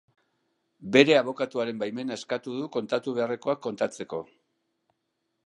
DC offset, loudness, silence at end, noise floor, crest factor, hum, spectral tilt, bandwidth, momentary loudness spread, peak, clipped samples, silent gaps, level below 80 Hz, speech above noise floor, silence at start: under 0.1%; -27 LUFS; 1.25 s; -79 dBFS; 26 dB; none; -5 dB/octave; 11 kHz; 14 LU; -2 dBFS; under 0.1%; none; -74 dBFS; 52 dB; 0.8 s